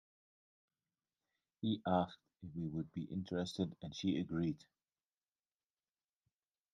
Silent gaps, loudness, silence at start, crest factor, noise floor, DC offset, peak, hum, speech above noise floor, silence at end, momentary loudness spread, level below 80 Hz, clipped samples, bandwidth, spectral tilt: none; -41 LUFS; 1.6 s; 22 dB; under -90 dBFS; under 0.1%; -22 dBFS; none; over 50 dB; 2.15 s; 9 LU; -74 dBFS; under 0.1%; 10.5 kHz; -7 dB/octave